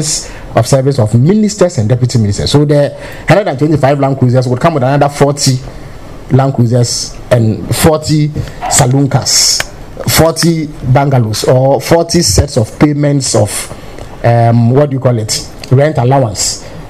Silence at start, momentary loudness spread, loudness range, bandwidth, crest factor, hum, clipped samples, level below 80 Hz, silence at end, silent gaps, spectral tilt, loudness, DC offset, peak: 0 s; 8 LU; 2 LU; 15.5 kHz; 10 dB; none; 0.3%; -30 dBFS; 0 s; none; -5 dB/octave; -10 LUFS; 0.7%; 0 dBFS